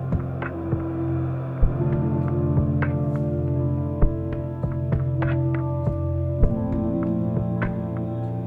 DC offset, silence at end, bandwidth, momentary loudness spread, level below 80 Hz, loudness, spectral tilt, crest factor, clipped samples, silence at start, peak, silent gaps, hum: under 0.1%; 0 s; 3.6 kHz; 5 LU; -30 dBFS; -25 LUFS; -11.5 dB/octave; 18 dB; under 0.1%; 0 s; -6 dBFS; none; none